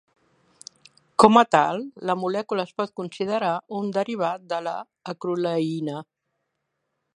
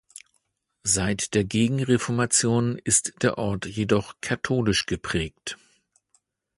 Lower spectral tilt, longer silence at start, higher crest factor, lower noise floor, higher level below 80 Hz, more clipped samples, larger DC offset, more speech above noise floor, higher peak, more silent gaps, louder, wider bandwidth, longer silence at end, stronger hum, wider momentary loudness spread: first, -5.5 dB/octave vs -4 dB/octave; first, 1.2 s vs 0.85 s; about the same, 24 dB vs 20 dB; first, -78 dBFS vs -73 dBFS; second, -66 dBFS vs -48 dBFS; neither; neither; first, 55 dB vs 49 dB; first, 0 dBFS vs -6 dBFS; neither; about the same, -23 LUFS vs -24 LUFS; about the same, 11 kHz vs 11.5 kHz; about the same, 1.15 s vs 1.05 s; neither; first, 16 LU vs 9 LU